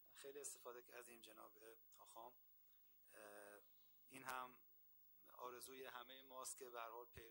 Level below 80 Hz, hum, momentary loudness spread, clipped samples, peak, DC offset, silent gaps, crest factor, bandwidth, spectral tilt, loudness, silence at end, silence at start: -88 dBFS; 50 Hz at -95 dBFS; 14 LU; under 0.1%; -32 dBFS; under 0.1%; none; 28 dB; 18 kHz; -1.5 dB/octave; -58 LUFS; 0 s; 0 s